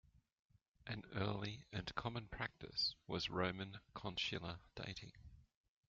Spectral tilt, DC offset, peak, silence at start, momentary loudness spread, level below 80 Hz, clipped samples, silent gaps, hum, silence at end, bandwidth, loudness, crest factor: -3 dB/octave; under 0.1%; -24 dBFS; 0.8 s; 11 LU; -66 dBFS; under 0.1%; none; none; 0.45 s; 7.4 kHz; -45 LUFS; 22 dB